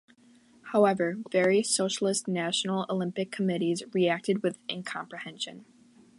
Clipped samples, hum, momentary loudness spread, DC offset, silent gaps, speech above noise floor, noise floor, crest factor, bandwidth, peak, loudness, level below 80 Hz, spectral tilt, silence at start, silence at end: under 0.1%; none; 12 LU; under 0.1%; none; 31 dB; -59 dBFS; 20 dB; 11.5 kHz; -10 dBFS; -28 LUFS; -78 dBFS; -4 dB/octave; 0.65 s; 0.55 s